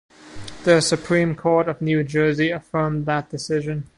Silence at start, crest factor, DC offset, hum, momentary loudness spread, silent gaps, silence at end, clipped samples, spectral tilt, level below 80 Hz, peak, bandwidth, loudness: 0.25 s; 18 dB; under 0.1%; none; 8 LU; none; 0.1 s; under 0.1%; -5.5 dB/octave; -50 dBFS; -2 dBFS; 11.5 kHz; -21 LUFS